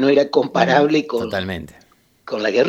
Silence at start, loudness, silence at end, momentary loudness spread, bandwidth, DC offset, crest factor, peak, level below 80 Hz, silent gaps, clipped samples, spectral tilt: 0 s; -18 LUFS; 0 s; 13 LU; 13.5 kHz; under 0.1%; 18 dB; 0 dBFS; -54 dBFS; none; under 0.1%; -6 dB/octave